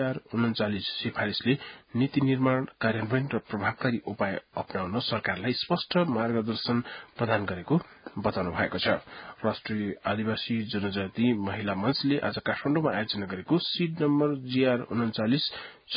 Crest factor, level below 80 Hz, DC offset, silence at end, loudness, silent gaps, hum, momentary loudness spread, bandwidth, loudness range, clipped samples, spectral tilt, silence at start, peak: 20 dB; -58 dBFS; under 0.1%; 0 s; -29 LUFS; none; none; 6 LU; 5.2 kHz; 2 LU; under 0.1%; -10.5 dB/octave; 0 s; -10 dBFS